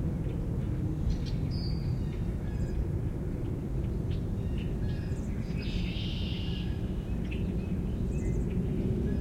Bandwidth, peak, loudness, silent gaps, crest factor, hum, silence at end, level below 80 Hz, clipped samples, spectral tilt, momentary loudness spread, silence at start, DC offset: 13 kHz; -18 dBFS; -33 LUFS; none; 14 dB; none; 0 s; -36 dBFS; under 0.1%; -8 dB/octave; 3 LU; 0 s; under 0.1%